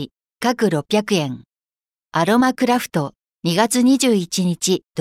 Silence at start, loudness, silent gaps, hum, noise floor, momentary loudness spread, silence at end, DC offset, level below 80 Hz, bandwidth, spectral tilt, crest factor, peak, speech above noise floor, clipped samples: 0 s; -18 LUFS; none; none; under -90 dBFS; 11 LU; 0 s; under 0.1%; -62 dBFS; 16 kHz; -4.5 dB/octave; 16 dB; -4 dBFS; over 72 dB; under 0.1%